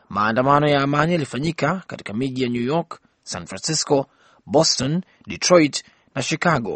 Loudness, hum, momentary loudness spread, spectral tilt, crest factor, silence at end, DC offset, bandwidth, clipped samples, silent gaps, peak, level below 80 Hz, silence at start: -20 LUFS; none; 15 LU; -4.5 dB/octave; 20 dB; 0 s; under 0.1%; 8.8 kHz; under 0.1%; none; -2 dBFS; -54 dBFS; 0.1 s